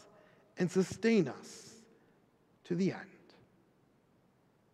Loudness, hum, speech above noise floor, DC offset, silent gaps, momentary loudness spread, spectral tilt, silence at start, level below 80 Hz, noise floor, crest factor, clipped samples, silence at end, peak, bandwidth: -33 LUFS; none; 37 dB; under 0.1%; none; 24 LU; -6.5 dB/octave; 0.55 s; -76 dBFS; -70 dBFS; 20 dB; under 0.1%; 1.65 s; -18 dBFS; 12.5 kHz